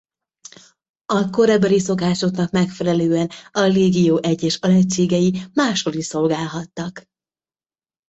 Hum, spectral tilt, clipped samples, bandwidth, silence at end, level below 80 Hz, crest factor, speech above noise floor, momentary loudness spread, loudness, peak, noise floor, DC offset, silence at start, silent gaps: none; -5.5 dB/octave; under 0.1%; 8.2 kHz; 1.1 s; -56 dBFS; 14 dB; over 72 dB; 8 LU; -18 LUFS; -4 dBFS; under -90 dBFS; under 0.1%; 1.1 s; none